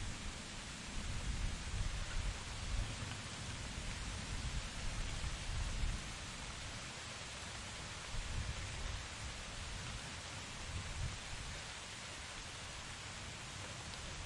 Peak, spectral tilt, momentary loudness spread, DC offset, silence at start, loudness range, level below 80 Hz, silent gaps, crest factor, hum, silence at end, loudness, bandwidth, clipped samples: -26 dBFS; -3 dB/octave; 4 LU; under 0.1%; 0 s; 2 LU; -48 dBFS; none; 18 dB; none; 0 s; -45 LUFS; 11.5 kHz; under 0.1%